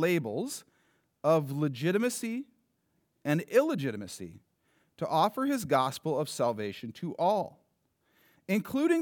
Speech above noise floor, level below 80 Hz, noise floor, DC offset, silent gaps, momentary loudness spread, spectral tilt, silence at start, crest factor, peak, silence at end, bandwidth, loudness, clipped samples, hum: 46 dB; -76 dBFS; -75 dBFS; under 0.1%; none; 13 LU; -5.5 dB/octave; 0 s; 20 dB; -12 dBFS; 0 s; over 20 kHz; -30 LUFS; under 0.1%; none